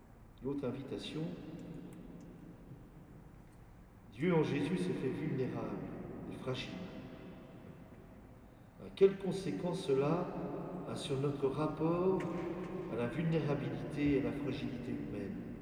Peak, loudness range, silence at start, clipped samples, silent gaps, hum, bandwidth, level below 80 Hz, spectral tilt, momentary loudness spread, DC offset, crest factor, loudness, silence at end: -16 dBFS; 10 LU; 0 s; under 0.1%; none; none; 12 kHz; -60 dBFS; -7.5 dB/octave; 22 LU; under 0.1%; 22 dB; -37 LUFS; 0 s